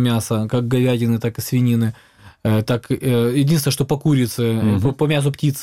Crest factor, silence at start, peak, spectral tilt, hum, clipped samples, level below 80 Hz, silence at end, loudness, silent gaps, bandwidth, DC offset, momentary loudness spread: 12 dB; 0 s; -6 dBFS; -6.5 dB/octave; none; under 0.1%; -48 dBFS; 0 s; -19 LUFS; none; 16 kHz; 0.2%; 4 LU